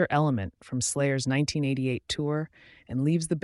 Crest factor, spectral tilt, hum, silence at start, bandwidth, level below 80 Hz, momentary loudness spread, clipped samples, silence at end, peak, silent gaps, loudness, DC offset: 16 dB; -5 dB/octave; none; 0 s; 11.5 kHz; -58 dBFS; 7 LU; under 0.1%; 0.05 s; -10 dBFS; none; -28 LUFS; under 0.1%